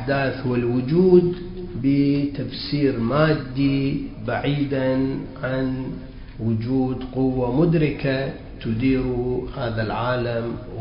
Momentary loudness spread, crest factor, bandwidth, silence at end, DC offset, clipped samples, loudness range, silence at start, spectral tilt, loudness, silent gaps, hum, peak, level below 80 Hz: 10 LU; 18 dB; 5.4 kHz; 0 s; under 0.1%; under 0.1%; 4 LU; 0 s; -12 dB/octave; -22 LUFS; none; none; -4 dBFS; -40 dBFS